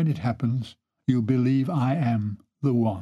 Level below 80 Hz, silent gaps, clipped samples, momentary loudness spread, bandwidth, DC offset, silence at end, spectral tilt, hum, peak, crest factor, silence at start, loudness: -62 dBFS; none; under 0.1%; 9 LU; 7.4 kHz; under 0.1%; 0 s; -9.5 dB/octave; none; -8 dBFS; 16 dB; 0 s; -25 LUFS